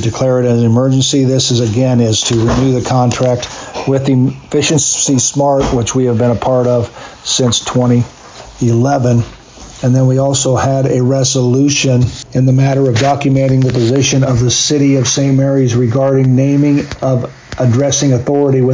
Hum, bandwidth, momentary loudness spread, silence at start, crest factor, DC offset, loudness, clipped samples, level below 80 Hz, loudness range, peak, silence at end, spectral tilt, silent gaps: none; 7.6 kHz; 5 LU; 0 s; 8 dB; under 0.1%; -12 LUFS; under 0.1%; -36 dBFS; 2 LU; -2 dBFS; 0 s; -5 dB/octave; none